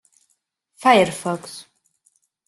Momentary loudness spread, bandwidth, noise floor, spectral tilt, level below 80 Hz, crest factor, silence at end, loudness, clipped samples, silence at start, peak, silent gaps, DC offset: 22 LU; 12.5 kHz; -70 dBFS; -4 dB/octave; -64 dBFS; 20 dB; 0.85 s; -19 LUFS; under 0.1%; 0.8 s; -2 dBFS; none; under 0.1%